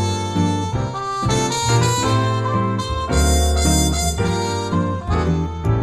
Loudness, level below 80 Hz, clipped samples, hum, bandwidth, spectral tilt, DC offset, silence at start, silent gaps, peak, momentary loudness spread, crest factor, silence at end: -19 LUFS; -26 dBFS; under 0.1%; none; 15.5 kHz; -5 dB/octave; under 0.1%; 0 s; none; -4 dBFS; 5 LU; 14 dB; 0 s